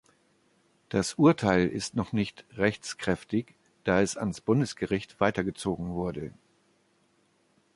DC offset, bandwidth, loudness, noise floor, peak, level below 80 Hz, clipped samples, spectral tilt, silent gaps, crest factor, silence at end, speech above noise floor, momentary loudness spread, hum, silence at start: under 0.1%; 11.5 kHz; -28 LUFS; -68 dBFS; -8 dBFS; -54 dBFS; under 0.1%; -5.5 dB/octave; none; 22 dB; 1.45 s; 41 dB; 11 LU; none; 0.9 s